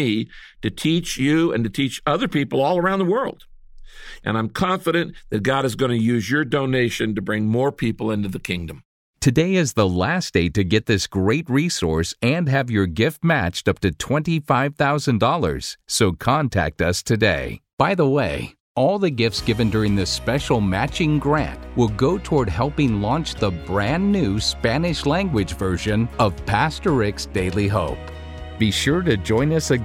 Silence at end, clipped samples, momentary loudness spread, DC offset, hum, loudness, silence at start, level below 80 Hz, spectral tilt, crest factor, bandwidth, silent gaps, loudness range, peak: 0 s; under 0.1%; 6 LU; under 0.1%; none; -21 LUFS; 0 s; -38 dBFS; -5.5 dB/octave; 18 dB; 16.5 kHz; 8.85-9.14 s, 17.73-17.77 s, 18.60-18.75 s; 2 LU; -2 dBFS